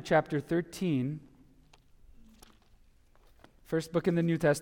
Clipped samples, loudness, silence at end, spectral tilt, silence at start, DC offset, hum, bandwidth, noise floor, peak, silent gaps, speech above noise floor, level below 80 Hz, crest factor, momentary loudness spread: under 0.1%; -31 LUFS; 0 s; -6.5 dB/octave; 0 s; under 0.1%; none; 16.5 kHz; -61 dBFS; -14 dBFS; none; 32 dB; -60 dBFS; 18 dB; 8 LU